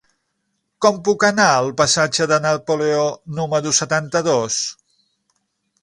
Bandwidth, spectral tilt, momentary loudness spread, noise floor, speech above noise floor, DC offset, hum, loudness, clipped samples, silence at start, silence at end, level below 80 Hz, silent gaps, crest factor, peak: 11.5 kHz; -3 dB/octave; 7 LU; -72 dBFS; 55 dB; under 0.1%; none; -17 LUFS; under 0.1%; 0.8 s; 1.1 s; -58 dBFS; none; 18 dB; 0 dBFS